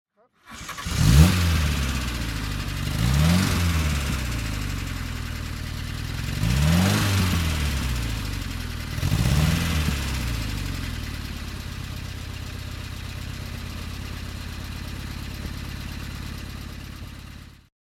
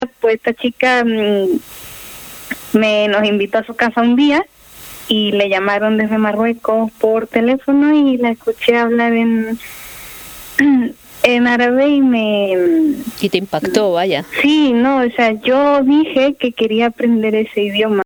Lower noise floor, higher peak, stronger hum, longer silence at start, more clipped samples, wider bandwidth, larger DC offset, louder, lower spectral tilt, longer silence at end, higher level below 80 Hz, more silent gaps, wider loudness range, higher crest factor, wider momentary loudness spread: first, -48 dBFS vs -36 dBFS; about the same, -2 dBFS vs 0 dBFS; neither; first, 0.45 s vs 0 s; neither; second, 17 kHz vs over 20 kHz; neither; second, -26 LUFS vs -14 LUFS; about the same, -5 dB/octave vs -5 dB/octave; first, 0.35 s vs 0 s; first, -30 dBFS vs -52 dBFS; neither; first, 12 LU vs 2 LU; first, 22 dB vs 14 dB; about the same, 14 LU vs 13 LU